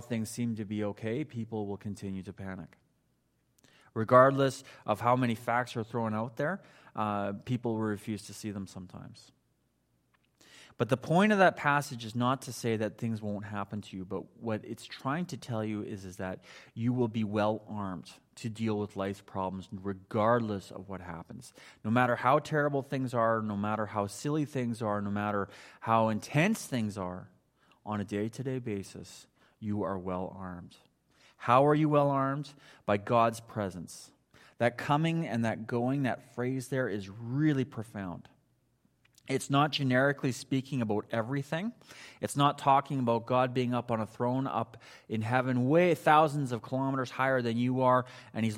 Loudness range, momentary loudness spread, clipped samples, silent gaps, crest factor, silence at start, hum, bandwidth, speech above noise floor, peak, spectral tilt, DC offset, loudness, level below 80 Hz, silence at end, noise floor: 9 LU; 16 LU; under 0.1%; none; 24 dB; 0 s; none; 16 kHz; 44 dB; -8 dBFS; -6.5 dB/octave; under 0.1%; -31 LUFS; -72 dBFS; 0 s; -74 dBFS